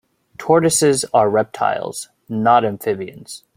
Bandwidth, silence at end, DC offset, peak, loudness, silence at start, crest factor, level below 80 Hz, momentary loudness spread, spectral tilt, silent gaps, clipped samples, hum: 16.5 kHz; 0.2 s; under 0.1%; -2 dBFS; -17 LUFS; 0.4 s; 16 dB; -58 dBFS; 16 LU; -4 dB/octave; none; under 0.1%; none